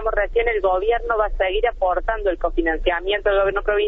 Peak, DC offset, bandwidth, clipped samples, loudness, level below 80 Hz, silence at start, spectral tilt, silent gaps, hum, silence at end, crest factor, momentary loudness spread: -6 dBFS; under 0.1%; 4 kHz; under 0.1%; -20 LUFS; -30 dBFS; 0 s; -7 dB/octave; none; none; 0 s; 14 dB; 3 LU